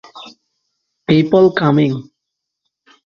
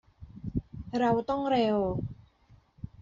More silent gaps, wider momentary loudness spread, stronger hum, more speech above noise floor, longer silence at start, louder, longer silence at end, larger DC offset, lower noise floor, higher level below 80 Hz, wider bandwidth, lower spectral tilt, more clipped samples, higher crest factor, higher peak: neither; first, 22 LU vs 17 LU; neither; first, 66 dB vs 34 dB; about the same, 0.15 s vs 0.2 s; first, -13 LUFS vs -30 LUFS; first, 1.05 s vs 0 s; neither; first, -78 dBFS vs -61 dBFS; about the same, -56 dBFS vs -52 dBFS; about the same, 7 kHz vs 7.6 kHz; first, -8.5 dB/octave vs -6 dB/octave; neither; about the same, 16 dB vs 16 dB; first, 0 dBFS vs -14 dBFS